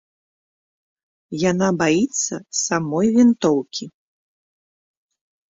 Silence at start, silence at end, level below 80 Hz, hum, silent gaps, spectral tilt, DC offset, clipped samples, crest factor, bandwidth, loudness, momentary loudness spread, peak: 1.3 s; 1.6 s; -60 dBFS; none; none; -4.5 dB/octave; under 0.1%; under 0.1%; 16 dB; 8 kHz; -19 LUFS; 15 LU; -6 dBFS